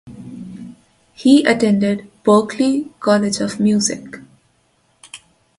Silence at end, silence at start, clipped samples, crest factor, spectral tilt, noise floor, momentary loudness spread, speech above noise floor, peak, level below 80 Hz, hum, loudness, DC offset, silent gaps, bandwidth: 0.4 s; 0.05 s; under 0.1%; 18 dB; -5 dB/octave; -60 dBFS; 24 LU; 45 dB; 0 dBFS; -56 dBFS; none; -16 LUFS; under 0.1%; none; 11.5 kHz